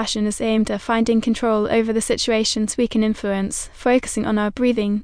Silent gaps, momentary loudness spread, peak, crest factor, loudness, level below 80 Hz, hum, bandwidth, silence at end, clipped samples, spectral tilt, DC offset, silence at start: none; 4 LU; -6 dBFS; 14 dB; -20 LUFS; -42 dBFS; none; 10.5 kHz; 0 s; under 0.1%; -4 dB/octave; under 0.1%; 0 s